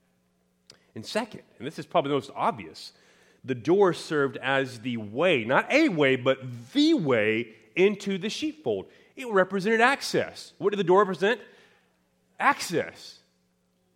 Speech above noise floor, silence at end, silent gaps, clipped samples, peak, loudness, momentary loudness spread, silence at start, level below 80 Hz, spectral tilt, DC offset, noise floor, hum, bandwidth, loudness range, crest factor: 44 dB; 0.85 s; none; under 0.1%; -4 dBFS; -25 LUFS; 18 LU; 0.95 s; -74 dBFS; -5 dB/octave; under 0.1%; -70 dBFS; none; 16 kHz; 4 LU; 22 dB